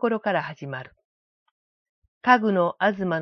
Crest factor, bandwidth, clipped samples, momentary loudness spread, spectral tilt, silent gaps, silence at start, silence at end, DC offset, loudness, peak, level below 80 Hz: 22 dB; 6.4 kHz; under 0.1%; 16 LU; -7.5 dB/octave; 1.05-2.02 s, 2.08-2.21 s; 0 s; 0 s; under 0.1%; -23 LUFS; -4 dBFS; -68 dBFS